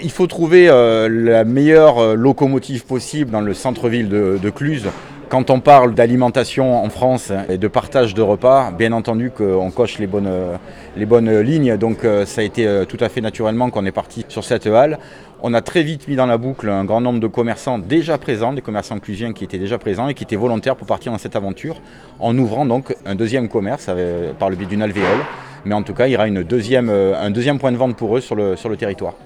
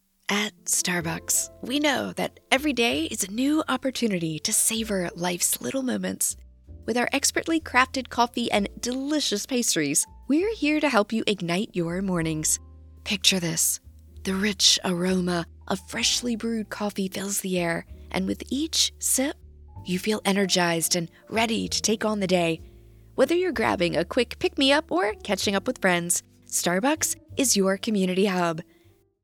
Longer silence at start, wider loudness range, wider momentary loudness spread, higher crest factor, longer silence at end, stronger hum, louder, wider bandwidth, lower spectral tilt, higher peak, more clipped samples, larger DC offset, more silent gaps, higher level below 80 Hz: second, 0 s vs 0.3 s; first, 6 LU vs 2 LU; first, 12 LU vs 8 LU; second, 16 dB vs 22 dB; second, 0.1 s vs 0.6 s; neither; first, -16 LUFS vs -24 LUFS; second, 13 kHz vs 18.5 kHz; first, -6.5 dB/octave vs -3 dB/octave; about the same, 0 dBFS vs -2 dBFS; neither; neither; neither; about the same, -48 dBFS vs -52 dBFS